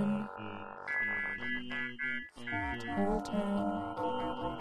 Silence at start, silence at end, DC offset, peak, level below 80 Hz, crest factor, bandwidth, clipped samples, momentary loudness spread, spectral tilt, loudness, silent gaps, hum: 0 s; 0 s; under 0.1%; -20 dBFS; -54 dBFS; 16 dB; 11 kHz; under 0.1%; 6 LU; -6.5 dB/octave; -36 LUFS; none; none